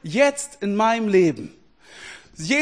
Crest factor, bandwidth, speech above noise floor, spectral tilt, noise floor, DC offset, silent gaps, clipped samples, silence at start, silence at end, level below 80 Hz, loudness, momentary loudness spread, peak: 18 dB; 10.5 kHz; 25 dB; -4.5 dB/octave; -45 dBFS; 0.1%; none; under 0.1%; 0.05 s; 0 s; -60 dBFS; -20 LUFS; 22 LU; -4 dBFS